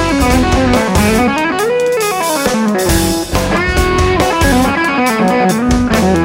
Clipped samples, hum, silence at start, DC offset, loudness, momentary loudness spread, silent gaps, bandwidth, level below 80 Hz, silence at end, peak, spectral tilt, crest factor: under 0.1%; none; 0 s; under 0.1%; -12 LUFS; 3 LU; none; 16.5 kHz; -22 dBFS; 0 s; 0 dBFS; -5 dB/octave; 12 dB